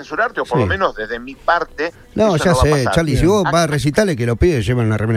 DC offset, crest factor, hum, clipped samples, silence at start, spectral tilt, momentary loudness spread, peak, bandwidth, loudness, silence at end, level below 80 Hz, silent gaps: under 0.1%; 14 dB; none; under 0.1%; 0 s; -6 dB/octave; 9 LU; -2 dBFS; 15.5 kHz; -16 LUFS; 0 s; -30 dBFS; none